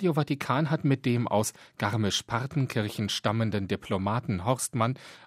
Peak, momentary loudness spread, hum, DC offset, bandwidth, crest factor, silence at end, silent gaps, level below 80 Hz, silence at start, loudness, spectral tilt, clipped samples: -8 dBFS; 4 LU; none; under 0.1%; 15.5 kHz; 20 dB; 0 s; none; -62 dBFS; 0 s; -28 LUFS; -5 dB/octave; under 0.1%